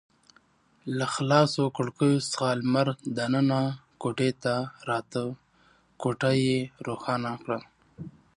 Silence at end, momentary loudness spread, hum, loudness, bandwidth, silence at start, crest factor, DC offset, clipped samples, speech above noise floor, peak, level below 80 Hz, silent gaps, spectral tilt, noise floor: 0.25 s; 11 LU; none; -27 LUFS; 11 kHz; 0.85 s; 20 dB; under 0.1%; under 0.1%; 36 dB; -8 dBFS; -66 dBFS; none; -6 dB/octave; -63 dBFS